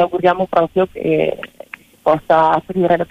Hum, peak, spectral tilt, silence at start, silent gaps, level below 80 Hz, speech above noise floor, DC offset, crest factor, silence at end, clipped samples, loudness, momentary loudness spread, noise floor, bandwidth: none; -2 dBFS; -7.5 dB/octave; 0 s; none; -50 dBFS; 23 dB; under 0.1%; 14 dB; 0.05 s; under 0.1%; -16 LUFS; 17 LU; -38 dBFS; 15 kHz